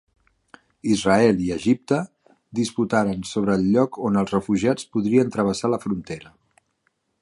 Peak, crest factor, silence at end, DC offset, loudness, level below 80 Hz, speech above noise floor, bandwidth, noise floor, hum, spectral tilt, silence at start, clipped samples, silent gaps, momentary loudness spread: -4 dBFS; 18 dB; 0.95 s; under 0.1%; -22 LUFS; -52 dBFS; 50 dB; 11.5 kHz; -71 dBFS; none; -6 dB/octave; 0.85 s; under 0.1%; none; 10 LU